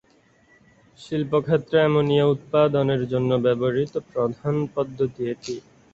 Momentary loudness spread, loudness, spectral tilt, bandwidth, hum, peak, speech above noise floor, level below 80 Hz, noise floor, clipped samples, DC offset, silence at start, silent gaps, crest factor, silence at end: 10 LU; -22 LUFS; -7.5 dB/octave; 8 kHz; none; -6 dBFS; 37 dB; -58 dBFS; -59 dBFS; under 0.1%; under 0.1%; 1 s; none; 18 dB; 0.35 s